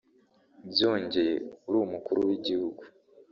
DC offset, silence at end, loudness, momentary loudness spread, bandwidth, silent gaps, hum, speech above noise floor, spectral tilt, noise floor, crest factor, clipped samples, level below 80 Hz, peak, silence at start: under 0.1%; 0.45 s; -29 LUFS; 8 LU; 7 kHz; none; none; 36 dB; -3 dB/octave; -65 dBFS; 20 dB; under 0.1%; -68 dBFS; -10 dBFS; 0.6 s